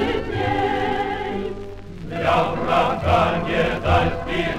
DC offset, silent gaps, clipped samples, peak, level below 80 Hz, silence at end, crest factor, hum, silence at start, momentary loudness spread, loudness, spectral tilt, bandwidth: under 0.1%; none; under 0.1%; -4 dBFS; -36 dBFS; 0 s; 16 dB; none; 0 s; 12 LU; -21 LUFS; -6.5 dB/octave; 13.5 kHz